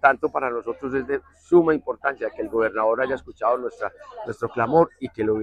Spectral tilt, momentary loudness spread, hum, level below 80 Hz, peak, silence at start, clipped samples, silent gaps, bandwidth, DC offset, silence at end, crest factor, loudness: -8 dB/octave; 11 LU; none; -56 dBFS; -2 dBFS; 0.05 s; under 0.1%; none; 8.6 kHz; under 0.1%; 0 s; 20 dB; -23 LUFS